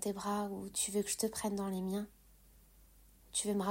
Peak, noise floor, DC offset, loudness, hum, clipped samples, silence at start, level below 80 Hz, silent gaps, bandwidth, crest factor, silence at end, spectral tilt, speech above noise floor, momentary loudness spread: -20 dBFS; -63 dBFS; under 0.1%; -37 LUFS; none; under 0.1%; 0 s; -64 dBFS; none; 16 kHz; 18 dB; 0 s; -4 dB/octave; 26 dB; 5 LU